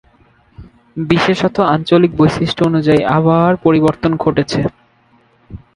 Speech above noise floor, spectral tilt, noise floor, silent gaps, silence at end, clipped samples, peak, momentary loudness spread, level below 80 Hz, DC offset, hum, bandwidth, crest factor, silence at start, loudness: 40 dB; -7 dB/octave; -52 dBFS; none; 0.2 s; under 0.1%; 0 dBFS; 6 LU; -42 dBFS; under 0.1%; none; 11 kHz; 14 dB; 0.6 s; -13 LUFS